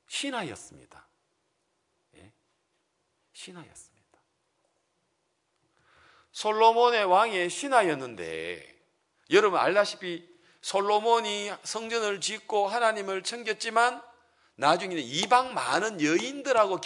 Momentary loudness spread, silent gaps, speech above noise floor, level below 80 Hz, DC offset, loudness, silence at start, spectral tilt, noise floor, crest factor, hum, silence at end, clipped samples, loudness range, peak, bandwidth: 16 LU; none; 49 dB; -78 dBFS; under 0.1%; -26 LUFS; 0.1 s; -3 dB/octave; -76 dBFS; 22 dB; none; 0 s; under 0.1%; 3 LU; -6 dBFS; 11 kHz